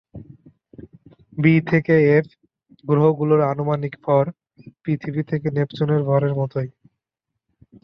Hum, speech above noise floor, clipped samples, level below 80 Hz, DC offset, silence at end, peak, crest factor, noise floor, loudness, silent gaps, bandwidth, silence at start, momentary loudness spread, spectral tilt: none; 63 dB; under 0.1%; -58 dBFS; under 0.1%; 1.15 s; -4 dBFS; 18 dB; -82 dBFS; -20 LUFS; none; 5.8 kHz; 0.15 s; 12 LU; -10.5 dB/octave